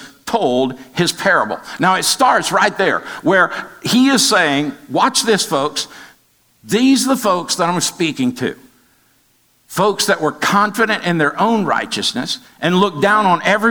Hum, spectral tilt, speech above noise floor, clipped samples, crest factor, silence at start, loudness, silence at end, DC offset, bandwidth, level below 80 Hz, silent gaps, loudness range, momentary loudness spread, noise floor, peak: none; -3.5 dB/octave; 41 dB; under 0.1%; 16 dB; 0 s; -15 LUFS; 0 s; 0.2%; over 20 kHz; -60 dBFS; none; 4 LU; 8 LU; -56 dBFS; 0 dBFS